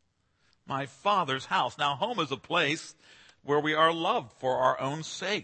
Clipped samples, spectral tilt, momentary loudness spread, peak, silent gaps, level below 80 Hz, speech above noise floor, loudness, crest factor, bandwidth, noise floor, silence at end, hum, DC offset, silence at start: under 0.1%; -4 dB/octave; 11 LU; -10 dBFS; none; -72 dBFS; 42 dB; -28 LUFS; 20 dB; 8.8 kHz; -71 dBFS; 0 s; none; under 0.1%; 0.65 s